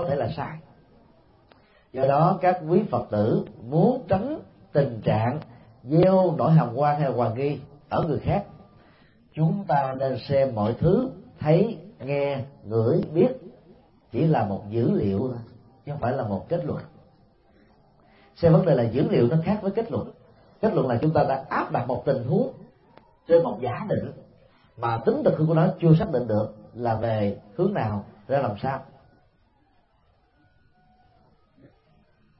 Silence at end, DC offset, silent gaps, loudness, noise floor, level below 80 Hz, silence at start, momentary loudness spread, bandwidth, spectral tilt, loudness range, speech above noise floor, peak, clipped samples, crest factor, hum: 3.55 s; under 0.1%; none; -24 LUFS; -63 dBFS; -54 dBFS; 0 s; 13 LU; 5.6 kHz; -12.5 dB/octave; 6 LU; 40 dB; -6 dBFS; under 0.1%; 20 dB; none